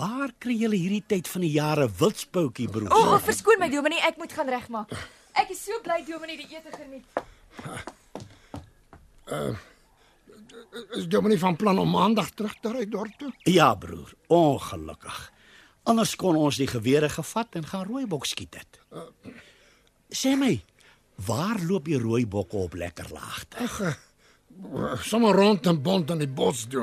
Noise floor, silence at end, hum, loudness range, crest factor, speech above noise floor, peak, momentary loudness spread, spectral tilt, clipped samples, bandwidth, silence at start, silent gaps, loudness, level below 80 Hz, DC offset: -60 dBFS; 0 s; none; 12 LU; 22 dB; 35 dB; -4 dBFS; 20 LU; -5 dB/octave; under 0.1%; 15 kHz; 0 s; none; -25 LUFS; -58 dBFS; under 0.1%